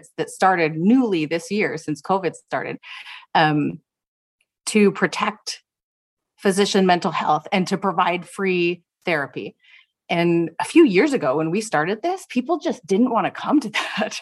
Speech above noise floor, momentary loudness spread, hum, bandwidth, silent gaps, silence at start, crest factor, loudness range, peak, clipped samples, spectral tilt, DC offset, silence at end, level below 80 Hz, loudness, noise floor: 29 dB; 12 LU; none; 12.5 kHz; 4.08-4.39 s, 5.83-6.17 s; 0.2 s; 20 dB; 3 LU; -2 dBFS; under 0.1%; -5 dB/octave; under 0.1%; 0 s; -70 dBFS; -21 LUFS; -50 dBFS